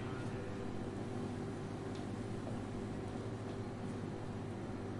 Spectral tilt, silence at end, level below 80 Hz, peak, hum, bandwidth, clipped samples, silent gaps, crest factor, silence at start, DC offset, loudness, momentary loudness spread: -7 dB/octave; 0 s; -58 dBFS; -30 dBFS; none; 11.5 kHz; under 0.1%; none; 12 dB; 0 s; under 0.1%; -44 LUFS; 1 LU